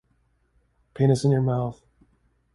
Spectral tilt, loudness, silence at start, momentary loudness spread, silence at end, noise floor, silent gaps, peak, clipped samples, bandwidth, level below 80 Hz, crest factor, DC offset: -8 dB/octave; -23 LUFS; 0.95 s; 8 LU; 0.8 s; -67 dBFS; none; -8 dBFS; under 0.1%; 11.5 kHz; -56 dBFS; 18 dB; under 0.1%